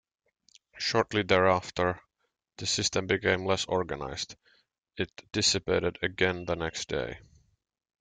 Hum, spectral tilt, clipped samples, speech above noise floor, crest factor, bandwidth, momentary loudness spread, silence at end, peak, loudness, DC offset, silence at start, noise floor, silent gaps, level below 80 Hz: none; -3.5 dB/octave; under 0.1%; 52 dB; 22 dB; 9.6 kHz; 12 LU; 0.8 s; -10 dBFS; -29 LUFS; under 0.1%; 0.75 s; -80 dBFS; none; -58 dBFS